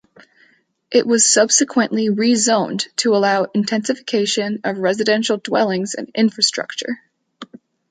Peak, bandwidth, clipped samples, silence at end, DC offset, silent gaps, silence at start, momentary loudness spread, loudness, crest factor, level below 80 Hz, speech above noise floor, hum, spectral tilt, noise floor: -2 dBFS; 9.6 kHz; under 0.1%; 0.45 s; under 0.1%; none; 0.9 s; 10 LU; -17 LUFS; 16 dB; -68 dBFS; 40 dB; none; -2.5 dB/octave; -57 dBFS